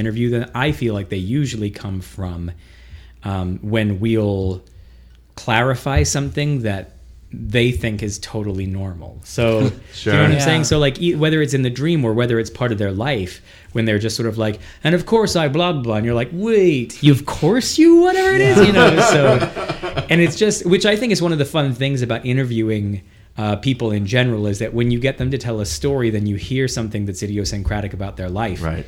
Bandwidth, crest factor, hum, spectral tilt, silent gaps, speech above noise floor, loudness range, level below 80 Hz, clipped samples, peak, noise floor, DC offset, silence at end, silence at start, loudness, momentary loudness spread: 16.5 kHz; 16 dB; none; -5.5 dB/octave; none; 27 dB; 9 LU; -36 dBFS; under 0.1%; 0 dBFS; -45 dBFS; under 0.1%; 0 s; 0 s; -18 LUFS; 12 LU